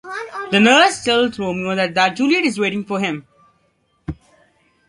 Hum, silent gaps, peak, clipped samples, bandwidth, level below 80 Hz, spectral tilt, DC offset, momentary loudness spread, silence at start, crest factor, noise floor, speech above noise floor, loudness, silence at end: none; none; 0 dBFS; under 0.1%; 11.5 kHz; -50 dBFS; -4 dB/octave; under 0.1%; 21 LU; 0.05 s; 18 dB; -63 dBFS; 47 dB; -16 LUFS; 0.75 s